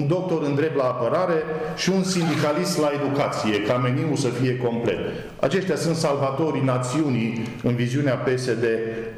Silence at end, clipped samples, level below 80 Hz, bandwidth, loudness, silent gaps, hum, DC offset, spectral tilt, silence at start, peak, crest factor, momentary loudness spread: 0 s; under 0.1%; -54 dBFS; 13.5 kHz; -23 LUFS; none; none; under 0.1%; -6 dB/octave; 0 s; -8 dBFS; 14 dB; 3 LU